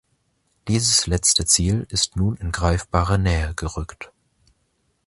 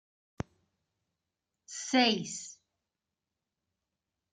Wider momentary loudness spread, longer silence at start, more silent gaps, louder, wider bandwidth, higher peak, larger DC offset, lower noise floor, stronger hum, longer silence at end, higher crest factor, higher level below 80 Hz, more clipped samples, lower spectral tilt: about the same, 17 LU vs 18 LU; second, 0.65 s vs 1.7 s; neither; first, -20 LUFS vs -30 LUFS; first, 11.5 kHz vs 9.6 kHz; first, -2 dBFS vs -12 dBFS; neither; second, -68 dBFS vs -89 dBFS; neither; second, 1 s vs 1.8 s; about the same, 20 dB vs 24 dB; first, -32 dBFS vs -68 dBFS; neither; about the same, -3.5 dB/octave vs -3 dB/octave